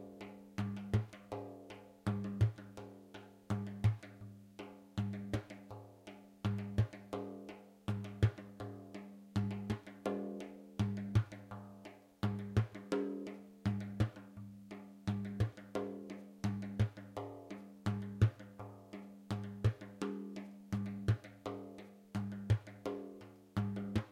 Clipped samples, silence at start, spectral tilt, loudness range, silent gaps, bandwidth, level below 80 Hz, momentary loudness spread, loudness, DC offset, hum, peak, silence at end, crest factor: under 0.1%; 0 s; -8 dB/octave; 3 LU; none; 11.5 kHz; -58 dBFS; 16 LU; -41 LUFS; under 0.1%; none; -18 dBFS; 0 s; 22 dB